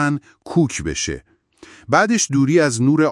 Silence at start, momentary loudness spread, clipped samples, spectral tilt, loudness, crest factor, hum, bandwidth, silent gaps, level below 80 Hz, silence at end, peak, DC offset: 0 s; 10 LU; under 0.1%; -5 dB/octave; -18 LUFS; 18 dB; none; 12 kHz; none; -46 dBFS; 0 s; 0 dBFS; under 0.1%